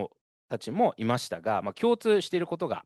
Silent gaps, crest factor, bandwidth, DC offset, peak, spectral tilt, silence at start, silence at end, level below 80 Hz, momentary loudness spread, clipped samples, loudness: 0.21-0.48 s; 16 dB; 12.5 kHz; under 0.1%; -12 dBFS; -5.5 dB/octave; 0 s; 0.05 s; -72 dBFS; 11 LU; under 0.1%; -28 LUFS